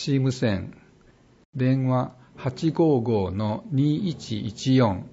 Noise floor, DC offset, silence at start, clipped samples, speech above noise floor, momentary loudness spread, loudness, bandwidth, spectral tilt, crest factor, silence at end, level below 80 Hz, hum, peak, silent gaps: -56 dBFS; under 0.1%; 0 s; under 0.1%; 32 dB; 11 LU; -24 LUFS; 8 kHz; -7.5 dB/octave; 16 dB; 0.05 s; -56 dBFS; none; -8 dBFS; 1.45-1.53 s